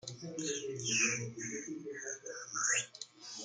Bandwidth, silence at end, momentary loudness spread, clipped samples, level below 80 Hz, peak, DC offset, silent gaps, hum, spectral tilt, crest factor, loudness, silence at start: 11 kHz; 0 s; 13 LU; under 0.1%; -80 dBFS; -18 dBFS; under 0.1%; none; none; -1.5 dB/octave; 20 dB; -36 LUFS; 0.05 s